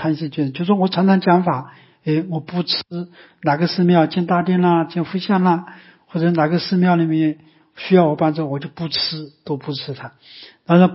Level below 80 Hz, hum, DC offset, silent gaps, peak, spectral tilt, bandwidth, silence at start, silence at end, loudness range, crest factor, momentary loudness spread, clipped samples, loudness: -64 dBFS; none; under 0.1%; none; -2 dBFS; -11 dB/octave; 5.8 kHz; 0 s; 0 s; 2 LU; 16 dB; 15 LU; under 0.1%; -18 LUFS